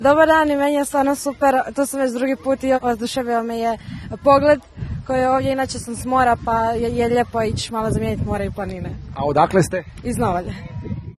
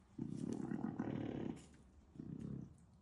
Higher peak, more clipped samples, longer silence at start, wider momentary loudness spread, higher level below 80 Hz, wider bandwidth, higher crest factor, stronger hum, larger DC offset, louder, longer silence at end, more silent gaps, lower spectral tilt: first, -2 dBFS vs -30 dBFS; neither; about the same, 0 s vs 0 s; second, 13 LU vs 16 LU; first, -38 dBFS vs -68 dBFS; first, 13 kHz vs 11.5 kHz; about the same, 18 dB vs 16 dB; neither; neither; first, -19 LUFS vs -47 LUFS; about the same, 0.05 s vs 0 s; neither; second, -5.5 dB/octave vs -8 dB/octave